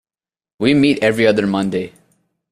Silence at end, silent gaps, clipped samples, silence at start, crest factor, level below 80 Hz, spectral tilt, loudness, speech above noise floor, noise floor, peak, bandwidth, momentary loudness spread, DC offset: 0.65 s; none; under 0.1%; 0.6 s; 16 dB; -52 dBFS; -6 dB/octave; -16 LUFS; over 75 dB; under -90 dBFS; -2 dBFS; 13 kHz; 10 LU; under 0.1%